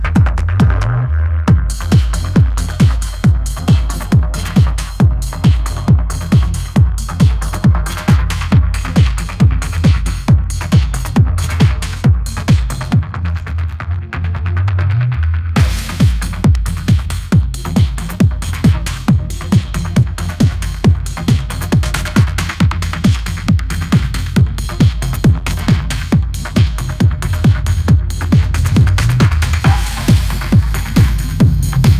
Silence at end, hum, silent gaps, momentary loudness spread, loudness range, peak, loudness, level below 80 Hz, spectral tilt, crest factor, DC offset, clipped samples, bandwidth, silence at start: 0 s; none; none; 3 LU; 2 LU; 0 dBFS; -14 LUFS; -18 dBFS; -6.5 dB/octave; 12 dB; under 0.1%; under 0.1%; 15.5 kHz; 0 s